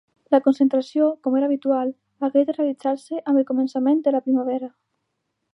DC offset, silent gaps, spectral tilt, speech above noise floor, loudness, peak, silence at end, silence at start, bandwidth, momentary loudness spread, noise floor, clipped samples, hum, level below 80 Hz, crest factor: under 0.1%; none; -6.5 dB/octave; 56 dB; -21 LUFS; -4 dBFS; 0.85 s; 0.3 s; 10 kHz; 8 LU; -76 dBFS; under 0.1%; none; -78 dBFS; 16 dB